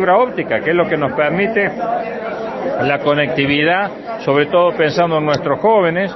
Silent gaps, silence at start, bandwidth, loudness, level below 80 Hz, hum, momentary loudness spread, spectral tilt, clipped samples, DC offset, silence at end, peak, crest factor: none; 0 s; 6 kHz; -16 LUFS; -52 dBFS; none; 8 LU; -6.5 dB/octave; under 0.1%; under 0.1%; 0 s; 0 dBFS; 14 dB